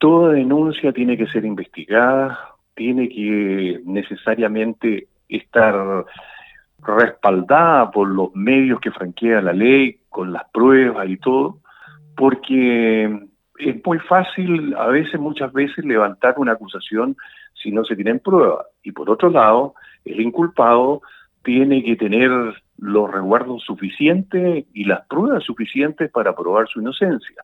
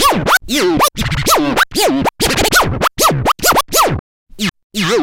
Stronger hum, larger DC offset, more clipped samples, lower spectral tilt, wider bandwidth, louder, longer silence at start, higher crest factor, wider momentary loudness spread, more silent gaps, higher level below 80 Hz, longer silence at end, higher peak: neither; neither; neither; first, -8.5 dB/octave vs -3 dB/octave; second, 4.1 kHz vs 17.5 kHz; second, -17 LUFS vs -13 LUFS; about the same, 0 s vs 0 s; about the same, 16 dB vs 14 dB; first, 13 LU vs 8 LU; second, none vs 3.99-4.26 s, 4.64-4.70 s; second, -64 dBFS vs -30 dBFS; about the same, 0 s vs 0 s; about the same, -2 dBFS vs 0 dBFS